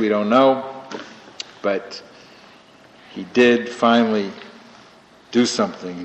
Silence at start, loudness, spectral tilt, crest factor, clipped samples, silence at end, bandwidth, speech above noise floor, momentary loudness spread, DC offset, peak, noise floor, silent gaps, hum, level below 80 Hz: 0 s; -19 LUFS; -4.5 dB/octave; 20 dB; under 0.1%; 0 s; 8.6 kHz; 30 dB; 21 LU; under 0.1%; -2 dBFS; -48 dBFS; none; none; -66 dBFS